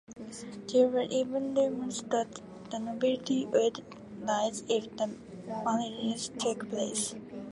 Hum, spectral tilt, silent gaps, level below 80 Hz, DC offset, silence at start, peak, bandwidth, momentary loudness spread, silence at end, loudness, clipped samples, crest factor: none; -4 dB/octave; none; -70 dBFS; under 0.1%; 0.1 s; -14 dBFS; 11.5 kHz; 15 LU; 0 s; -31 LUFS; under 0.1%; 18 dB